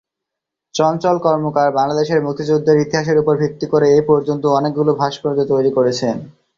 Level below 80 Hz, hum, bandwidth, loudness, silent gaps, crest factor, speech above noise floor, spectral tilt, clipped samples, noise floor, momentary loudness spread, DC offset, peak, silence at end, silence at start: -54 dBFS; none; 7.4 kHz; -16 LUFS; none; 14 dB; 67 dB; -6.5 dB/octave; under 0.1%; -82 dBFS; 5 LU; under 0.1%; -2 dBFS; 0.25 s; 0.75 s